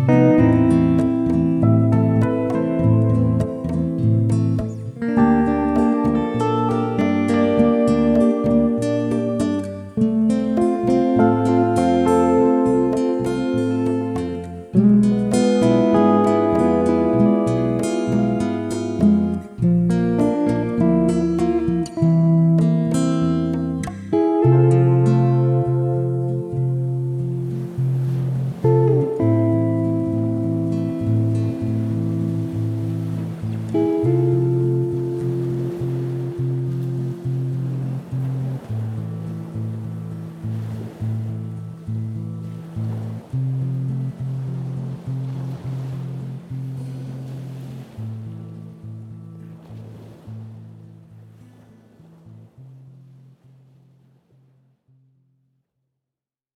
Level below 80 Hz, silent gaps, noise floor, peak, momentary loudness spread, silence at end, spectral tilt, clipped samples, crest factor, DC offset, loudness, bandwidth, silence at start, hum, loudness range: -46 dBFS; none; -88 dBFS; -2 dBFS; 15 LU; 3.65 s; -9 dB/octave; under 0.1%; 16 dB; under 0.1%; -19 LUFS; 11 kHz; 0 s; none; 12 LU